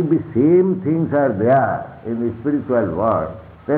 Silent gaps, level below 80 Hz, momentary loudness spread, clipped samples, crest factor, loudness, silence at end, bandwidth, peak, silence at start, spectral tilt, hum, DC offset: none; -50 dBFS; 11 LU; under 0.1%; 12 dB; -18 LUFS; 0 s; 3.8 kHz; -4 dBFS; 0 s; -12.5 dB/octave; none; under 0.1%